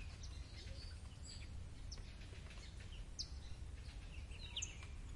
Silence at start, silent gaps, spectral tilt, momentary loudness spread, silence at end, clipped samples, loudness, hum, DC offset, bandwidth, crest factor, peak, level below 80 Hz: 0 s; none; -3 dB/octave; 7 LU; 0 s; under 0.1%; -52 LUFS; none; under 0.1%; 11.5 kHz; 18 dB; -32 dBFS; -54 dBFS